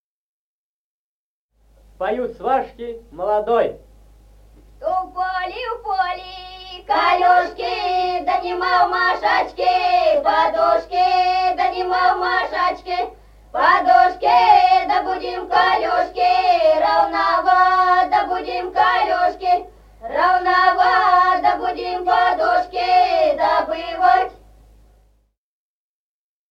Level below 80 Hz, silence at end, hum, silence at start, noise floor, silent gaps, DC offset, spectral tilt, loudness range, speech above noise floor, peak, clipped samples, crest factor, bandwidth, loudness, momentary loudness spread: -48 dBFS; 2.15 s; none; 2 s; under -90 dBFS; none; under 0.1%; -4 dB/octave; 8 LU; over 73 dB; -2 dBFS; under 0.1%; 16 dB; 7.2 kHz; -17 LUFS; 11 LU